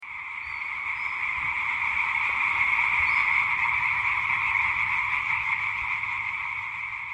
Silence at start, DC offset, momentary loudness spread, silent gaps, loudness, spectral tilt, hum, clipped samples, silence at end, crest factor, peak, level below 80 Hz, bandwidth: 0 s; under 0.1%; 9 LU; none; -24 LUFS; -2 dB/octave; none; under 0.1%; 0 s; 16 dB; -12 dBFS; -54 dBFS; 11 kHz